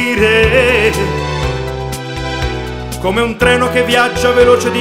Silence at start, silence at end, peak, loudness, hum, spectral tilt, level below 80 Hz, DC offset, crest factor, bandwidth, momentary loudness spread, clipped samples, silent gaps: 0 s; 0 s; 0 dBFS; -13 LUFS; none; -4.5 dB/octave; -26 dBFS; under 0.1%; 12 dB; 16 kHz; 12 LU; under 0.1%; none